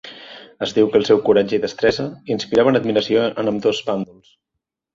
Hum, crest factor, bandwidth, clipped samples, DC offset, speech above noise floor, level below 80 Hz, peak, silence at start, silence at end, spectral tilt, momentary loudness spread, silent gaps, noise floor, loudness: none; 16 dB; 7.6 kHz; under 0.1%; under 0.1%; 63 dB; -56 dBFS; -2 dBFS; 0.05 s; 0.9 s; -5.5 dB/octave; 12 LU; none; -80 dBFS; -18 LUFS